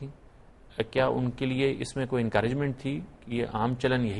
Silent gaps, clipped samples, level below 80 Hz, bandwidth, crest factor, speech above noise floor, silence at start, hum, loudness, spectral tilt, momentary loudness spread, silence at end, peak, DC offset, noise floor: none; under 0.1%; -52 dBFS; 11.5 kHz; 18 dB; 25 dB; 0 s; none; -29 LUFS; -6.5 dB/octave; 9 LU; 0 s; -10 dBFS; under 0.1%; -53 dBFS